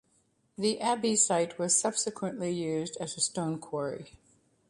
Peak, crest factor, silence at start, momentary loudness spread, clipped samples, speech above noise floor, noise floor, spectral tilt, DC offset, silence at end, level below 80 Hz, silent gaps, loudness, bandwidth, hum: -12 dBFS; 20 dB; 0.6 s; 10 LU; under 0.1%; 40 dB; -71 dBFS; -3 dB/octave; under 0.1%; 0.6 s; -72 dBFS; none; -29 LUFS; 11.5 kHz; none